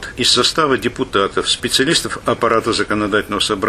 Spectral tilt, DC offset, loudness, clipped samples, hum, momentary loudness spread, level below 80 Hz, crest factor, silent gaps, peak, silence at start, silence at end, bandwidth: -3 dB/octave; under 0.1%; -16 LUFS; under 0.1%; none; 5 LU; -42 dBFS; 14 dB; none; -2 dBFS; 0 s; 0 s; 15 kHz